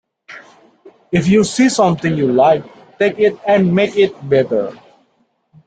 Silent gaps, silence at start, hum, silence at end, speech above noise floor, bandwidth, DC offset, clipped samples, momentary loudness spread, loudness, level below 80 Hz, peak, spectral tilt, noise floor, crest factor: none; 0.3 s; none; 0.9 s; 48 dB; 9.4 kHz; under 0.1%; under 0.1%; 6 LU; -14 LUFS; -52 dBFS; -2 dBFS; -6 dB/octave; -61 dBFS; 14 dB